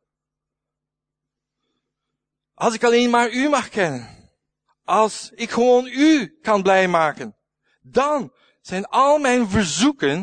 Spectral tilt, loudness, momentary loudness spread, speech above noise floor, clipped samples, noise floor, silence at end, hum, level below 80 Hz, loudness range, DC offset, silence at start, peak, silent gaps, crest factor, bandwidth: -4 dB/octave; -19 LUFS; 13 LU; 66 dB; under 0.1%; -84 dBFS; 0 s; none; -52 dBFS; 3 LU; under 0.1%; 2.6 s; -4 dBFS; none; 18 dB; 9.6 kHz